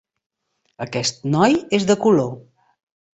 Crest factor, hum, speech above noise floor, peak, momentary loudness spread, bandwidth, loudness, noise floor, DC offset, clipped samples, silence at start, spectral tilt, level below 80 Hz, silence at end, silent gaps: 18 dB; none; 34 dB; -2 dBFS; 13 LU; 8.2 kHz; -19 LUFS; -52 dBFS; under 0.1%; under 0.1%; 0.8 s; -5 dB/octave; -58 dBFS; 0.75 s; none